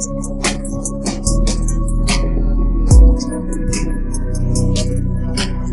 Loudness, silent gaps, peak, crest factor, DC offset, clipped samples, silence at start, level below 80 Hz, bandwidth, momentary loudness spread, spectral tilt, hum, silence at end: -18 LUFS; none; 0 dBFS; 14 dB; 1%; under 0.1%; 0 s; -16 dBFS; 11.5 kHz; 10 LU; -5 dB/octave; none; 0 s